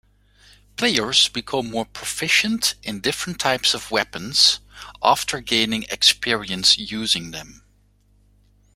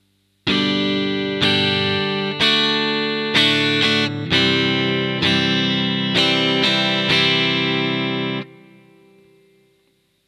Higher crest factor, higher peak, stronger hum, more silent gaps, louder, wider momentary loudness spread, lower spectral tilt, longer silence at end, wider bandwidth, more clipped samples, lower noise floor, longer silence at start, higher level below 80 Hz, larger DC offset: about the same, 22 dB vs 18 dB; about the same, -2 dBFS vs 0 dBFS; first, 50 Hz at -50 dBFS vs none; neither; about the same, -19 LUFS vs -17 LUFS; first, 11 LU vs 6 LU; second, -1.5 dB/octave vs -4.5 dB/octave; second, 1.2 s vs 1.75 s; first, 16 kHz vs 13.5 kHz; neither; second, -58 dBFS vs -63 dBFS; first, 0.8 s vs 0.45 s; about the same, -52 dBFS vs -56 dBFS; neither